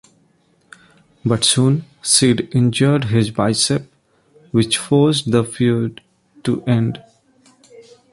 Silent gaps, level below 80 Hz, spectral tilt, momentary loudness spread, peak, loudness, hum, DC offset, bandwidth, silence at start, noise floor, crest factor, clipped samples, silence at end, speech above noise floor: none; -52 dBFS; -4.5 dB/octave; 10 LU; 0 dBFS; -17 LUFS; none; under 0.1%; 11.5 kHz; 1.25 s; -58 dBFS; 18 dB; under 0.1%; 0.3 s; 42 dB